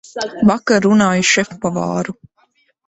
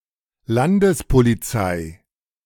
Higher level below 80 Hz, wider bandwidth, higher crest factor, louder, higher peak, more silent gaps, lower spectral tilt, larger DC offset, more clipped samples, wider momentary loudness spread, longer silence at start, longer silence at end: second, -52 dBFS vs -34 dBFS; second, 8.2 kHz vs 18 kHz; about the same, 14 dB vs 16 dB; first, -15 LUFS vs -19 LUFS; about the same, -2 dBFS vs -2 dBFS; neither; second, -4.5 dB/octave vs -6.5 dB/octave; neither; neither; about the same, 11 LU vs 9 LU; second, 0.15 s vs 0.5 s; first, 0.75 s vs 0.5 s